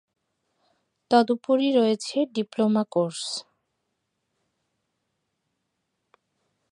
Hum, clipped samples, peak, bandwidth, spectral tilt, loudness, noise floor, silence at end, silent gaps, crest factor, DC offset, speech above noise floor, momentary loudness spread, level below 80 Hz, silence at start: none; under 0.1%; -4 dBFS; 11 kHz; -5 dB/octave; -24 LUFS; -78 dBFS; 3.3 s; none; 22 dB; under 0.1%; 56 dB; 9 LU; -80 dBFS; 1.1 s